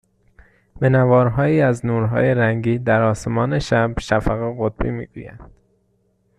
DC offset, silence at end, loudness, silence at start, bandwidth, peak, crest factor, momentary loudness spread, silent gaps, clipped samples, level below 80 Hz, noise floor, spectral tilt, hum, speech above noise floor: under 0.1%; 0.95 s; -18 LUFS; 0.75 s; 10.5 kHz; -4 dBFS; 16 dB; 10 LU; none; under 0.1%; -38 dBFS; -63 dBFS; -7.5 dB/octave; none; 46 dB